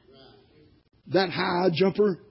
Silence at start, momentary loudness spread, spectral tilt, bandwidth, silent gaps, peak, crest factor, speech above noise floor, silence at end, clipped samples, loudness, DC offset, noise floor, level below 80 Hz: 1.05 s; 3 LU; -10 dB/octave; 5.8 kHz; none; -8 dBFS; 18 dB; 34 dB; 0.15 s; under 0.1%; -24 LUFS; under 0.1%; -58 dBFS; -64 dBFS